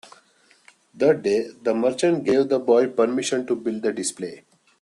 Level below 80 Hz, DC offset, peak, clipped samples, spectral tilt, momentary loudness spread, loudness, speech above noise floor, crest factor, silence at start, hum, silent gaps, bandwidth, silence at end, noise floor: -68 dBFS; under 0.1%; -6 dBFS; under 0.1%; -4.5 dB/octave; 8 LU; -22 LUFS; 37 dB; 18 dB; 0.95 s; none; none; 12 kHz; 0.45 s; -58 dBFS